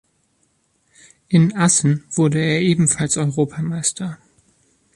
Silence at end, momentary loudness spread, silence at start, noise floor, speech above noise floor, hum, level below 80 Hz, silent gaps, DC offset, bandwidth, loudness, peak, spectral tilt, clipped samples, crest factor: 0.8 s; 7 LU; 1.3 s; -64 dBFS; 47 dB; none; -56 dBFS; none; under 0.1%; 11.5 kHz; -18 LUFS; -4 dBFS; -5 dB/octave; under 0.1%; 16 dB